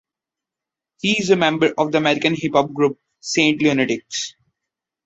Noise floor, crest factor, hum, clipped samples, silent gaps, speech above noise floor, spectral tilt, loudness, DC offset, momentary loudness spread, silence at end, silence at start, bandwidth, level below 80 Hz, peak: -87 dBFS; 18 dB; none; under 0.1%; none; 69 dB; -4 dB/octave; -18 LUFS; under 0.1%; 9 LU; 0.75 s; 1.05 s; 8.2 kHz; -60 dBFS; -2 dBFS